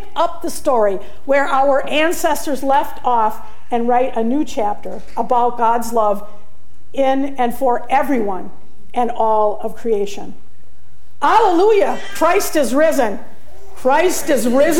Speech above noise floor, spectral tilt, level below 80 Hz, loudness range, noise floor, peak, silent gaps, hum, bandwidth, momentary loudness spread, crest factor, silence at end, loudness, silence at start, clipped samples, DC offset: 34 dB; -4 dB/octave; -46 dBFS; 3 LU; -51 dBFS; -2 dBFS; none; none; 17 kHz; 11 LU; 14 dB; 0 s; -17 LUFS; 0 s; under 0.1%; 10%